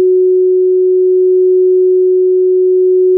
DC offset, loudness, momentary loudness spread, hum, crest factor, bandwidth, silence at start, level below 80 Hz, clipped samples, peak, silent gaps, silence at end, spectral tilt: under 0.1%; -10 LUFS; 1 LU; none; 4 dB; 0.5 kHz; 0 s; under -90 dBFS; under 0.1%; -6 dBFS; none; 0 s; -16 dB/octave